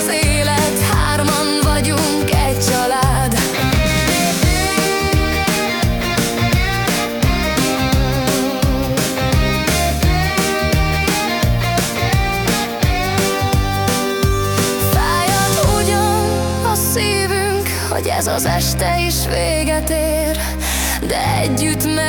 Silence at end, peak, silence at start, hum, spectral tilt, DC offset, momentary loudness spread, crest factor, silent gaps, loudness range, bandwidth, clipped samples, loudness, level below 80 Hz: 0 s; -4 dBFS; 0 s; none; -4 dB/octave; under 0.1%; 3 LU; 12 dB; none; 2 LU; 19 kHz; under 0.1%; -16 LUFS; -24 dBFS